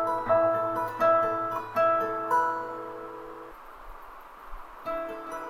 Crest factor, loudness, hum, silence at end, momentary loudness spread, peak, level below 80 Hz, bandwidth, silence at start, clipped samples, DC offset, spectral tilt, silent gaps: 16 dB; -27 LUFS; none; 0 s; 22 LU; -12 dBFS; -54 dBFS; 16 kHz; 0 s; under 0.1%; under 0.1%; -6 dB/octave; none